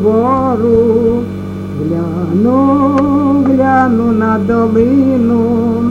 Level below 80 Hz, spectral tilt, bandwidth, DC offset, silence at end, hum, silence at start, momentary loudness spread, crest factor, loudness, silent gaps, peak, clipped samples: -38 dBFS; -9.5 dB/octave; 7.2 kHz; under 0.1%; 0 s; none; 0 s; 7 LU; 10 dB; -11 LUFS; none; 0 dBFS; under 0.1%